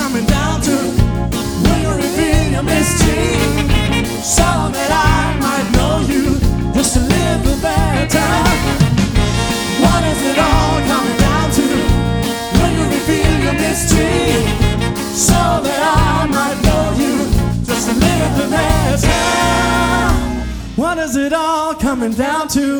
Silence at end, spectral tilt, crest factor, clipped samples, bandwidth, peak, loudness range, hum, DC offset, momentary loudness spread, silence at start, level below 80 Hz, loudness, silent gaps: 0 s; -4.5 dB/octave; 14 dB; under 0.1%; over 20 kHz; 0 dBFS; 1 LU; none; under 0.1%; 4 LU; 0 s; -22 dBFS; -14 LUFS; none